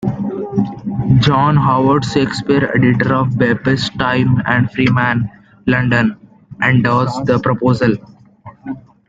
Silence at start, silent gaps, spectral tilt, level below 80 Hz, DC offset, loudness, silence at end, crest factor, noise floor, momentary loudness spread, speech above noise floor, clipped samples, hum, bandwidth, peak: 0 s; none; -7 dB/octave; -42 dBFS; under 0.1%; -15 LUFS; 0.3 s; 14 dB; -39 dBFS; 9 LU; 26 dB; under 0.1%; none; 7.8 kHz; 0 dBFS